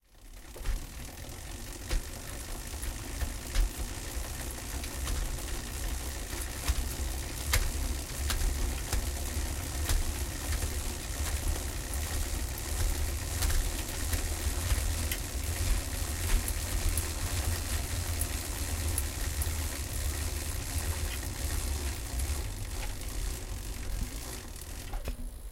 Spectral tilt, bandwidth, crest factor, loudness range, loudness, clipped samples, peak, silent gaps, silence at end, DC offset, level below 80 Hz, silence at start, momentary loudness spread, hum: -3.5 dB/octave; 17 kHz; 22 dB; 5 LU; -35 LUFS; under 0.1%; -10 dBFS; none; 0 s; under 0.1%; -34 dBFS; 0.15 s; 8 LU; none